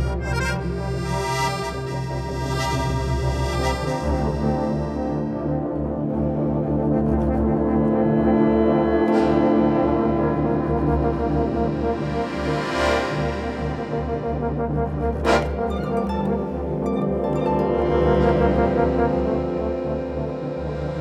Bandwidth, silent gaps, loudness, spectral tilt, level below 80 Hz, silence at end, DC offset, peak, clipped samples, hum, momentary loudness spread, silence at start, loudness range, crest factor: 13.5 kHz; none; -22 LUFS; -7 dB/octave; -32 dBFS; 0 s; under 0.1%; -4 dBFS; under 0.1%; none; 8 LU; 0 s; 5 LU; 16 dB